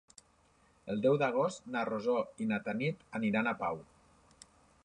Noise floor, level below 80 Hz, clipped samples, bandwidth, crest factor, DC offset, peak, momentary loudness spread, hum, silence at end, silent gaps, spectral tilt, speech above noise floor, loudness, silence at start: -68 dBFS; -72 dBFS; under 0.1%; 11 kHz; 18 dB; under 0.1%; -18 dBFS; 9 LU; none; 1 s; none; -6.5 dB/octave; 35 dB; -34 LUFS; 0.85 s